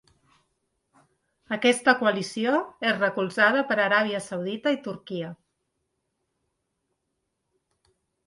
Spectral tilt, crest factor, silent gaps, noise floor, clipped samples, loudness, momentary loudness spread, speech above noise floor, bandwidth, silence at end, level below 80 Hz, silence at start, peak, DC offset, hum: -4 dB/octave; 24 dB; none; -79 dBFS; under 0.1%; -24 LUFS; 13 LU; 55 dB; 11.5 kHz; 2.95 s; -74 dBFS; 1.5 s; -4 dBFS; under 0.1%; none